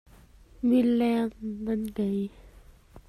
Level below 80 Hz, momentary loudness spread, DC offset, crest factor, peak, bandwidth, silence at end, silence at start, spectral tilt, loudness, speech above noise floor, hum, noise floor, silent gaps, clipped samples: -54 dBFS; 10 LU; under 0.1%; 14 dB; -14 dBFS; 13.5 kHz; 0.1 s; 0.6 s; -7.5 dB/octave; -27 LUFS; 27 dB; none; -54 dBFS; none; under 0.1%